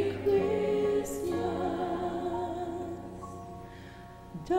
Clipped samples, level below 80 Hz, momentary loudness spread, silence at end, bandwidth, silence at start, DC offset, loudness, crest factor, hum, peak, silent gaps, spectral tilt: under 0.1%; -54 dBFS; 18 LU; 0 s; 16 kHz; 0 s; under 0.1%; -31 LUFS; 16 dB; none; -16 dBFS; none; -6.5 dB/octave